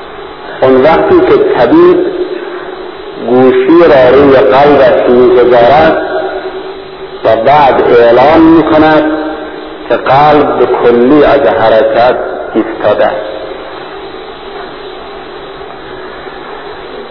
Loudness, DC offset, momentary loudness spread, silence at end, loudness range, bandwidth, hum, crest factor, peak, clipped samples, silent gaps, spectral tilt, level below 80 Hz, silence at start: -6 LUFS; 1%; 20 LU; 0 s; 11 LU; 5.4 kHz; none; 8 dB; 0 dBFS; 3%; none; -8 dB/octave; -36 dBFS; 0 s